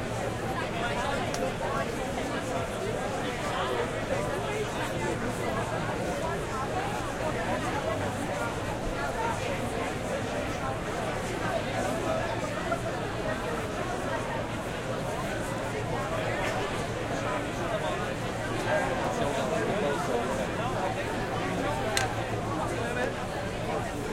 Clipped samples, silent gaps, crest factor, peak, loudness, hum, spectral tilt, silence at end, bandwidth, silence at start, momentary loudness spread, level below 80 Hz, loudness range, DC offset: under 0.1%; none; 22 dB; -8 dBFS; -31 LUFS; none; -5 dB/octave; 0 s; 16.5 kHz; 0 s; 3 LU; -46 dBFS; 2 LU; under 0.1%